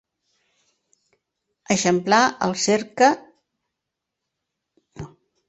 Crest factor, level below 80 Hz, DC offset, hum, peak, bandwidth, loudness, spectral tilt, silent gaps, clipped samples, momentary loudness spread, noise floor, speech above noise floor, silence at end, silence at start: 22 dB; -62 dBFS; under 0.1%; none; -2 dBFS; 8.2 kHz; -20 LUFS; -3.5 dB/octave; none; under 0.1%; 22 LU; -83 dBFS; 64 dB; 0.4 s; 1.7 s